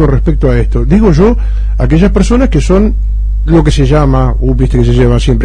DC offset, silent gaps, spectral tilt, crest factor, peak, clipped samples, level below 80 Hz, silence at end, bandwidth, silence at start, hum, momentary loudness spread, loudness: under 0.1%; none; -7.5 dB/octave; 8 dB; 0 dBFS; 0.1%; -10 dBFS; 0 s; 9.8 kHz; 0 s; none; 6 LU; -9 LUFS